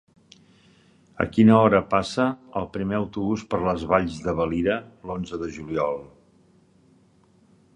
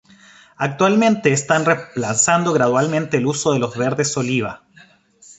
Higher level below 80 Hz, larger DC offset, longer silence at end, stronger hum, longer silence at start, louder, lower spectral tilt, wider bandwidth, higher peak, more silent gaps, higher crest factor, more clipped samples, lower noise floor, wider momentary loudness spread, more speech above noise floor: first, -48 dBFS vs -58 dBFS; neither; first, 1.75 s vs 0.05 s; neither; first, 1.2 s vs 0.6 s; second, -23 LUFS vs -18 LUFS; first, -7 dB/octave vs -4.5 dB/octave; first, 10 kHz vs 8.4 kHz; about the same, -2 dBFS vs -2 dBFS; neither; first, 22 dB vs 16 dB; neither; first, -59 dBFS vs -50 dBFS; first, 14 LU vs 6 LU; about the same, 36 dB vs 33 dB